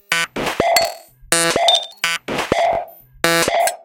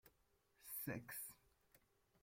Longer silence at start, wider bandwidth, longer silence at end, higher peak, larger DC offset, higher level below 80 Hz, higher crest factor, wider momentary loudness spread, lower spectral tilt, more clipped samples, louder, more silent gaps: about the same, 0.1 s vs 0.05 s; about the same, 17.5 kHz vs 16.5 kHz; second, 0.1 s vs 0.45 s; first, 0 dBFS vs -32 dBFS; neither; first, -46 dBFS vs -82 dBFS; about the same, 18 dB vs 22 dB; second, 8 LU vs 15 LU; second, -1.5 dB/octave vs -4 dB/octave; neither; first, -17 LUFS vs -50 LUFS; neither